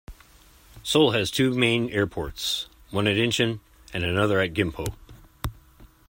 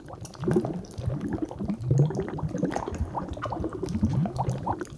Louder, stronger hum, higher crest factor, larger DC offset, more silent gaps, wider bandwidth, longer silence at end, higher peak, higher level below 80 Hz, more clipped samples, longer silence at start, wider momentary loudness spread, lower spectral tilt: first, -24 LUFS vs -29 LUFS; neither; about the same, 20 dB vs 18 dB; neither; neither; first, 16.5 kHz vs 11 kHz; first, 0.25 s vs 0 s; first, -6 dBFS vs -10 dBFS; about the same, -46 dBFS vs -42 dBFS; neither; about the same, 0.1 s vs 0 s; first, 15 LU vs 8 LU; second, -4.5 dB/octave vs -8 dB/octave